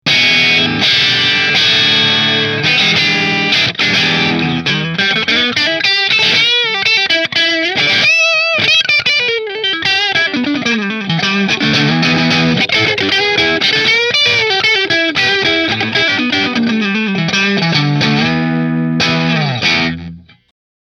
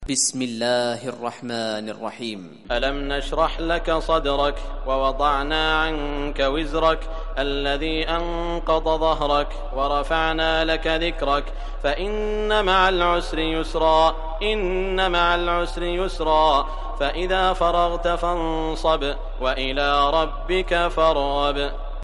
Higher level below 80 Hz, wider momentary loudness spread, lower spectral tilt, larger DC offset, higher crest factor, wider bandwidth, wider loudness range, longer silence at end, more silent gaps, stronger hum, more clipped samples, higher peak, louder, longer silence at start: second, -48 dBFS vs -30 dBFS; second, 6 LU vs 9 LU; about the same, -3.5 dB/octave vs -3.5 dB/octave; neither; second, 12 dB vs 18 dB; first, 15 kHz vs 11.5 kHz; about the same, 3 LU vs 3 LU; first, 0.65 s vs 0 s; neither; neither; neither; first, 0 dBFS vs -4 dBFS; first, -11 LUFS vs -22 LUFS; about the same, 0.05 s vs 0 s